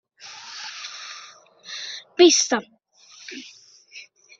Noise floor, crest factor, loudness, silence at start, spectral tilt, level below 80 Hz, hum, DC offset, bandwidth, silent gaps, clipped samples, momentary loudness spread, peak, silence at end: -50 dBFS; 24 dB; -21 LUFS; 0.25 s; -1 dB/octave; -72 dBFS; none; under 0.1%; 7.8 kHz; none; under 0.1%; 27 LU; -2 dBFS; 0.4 s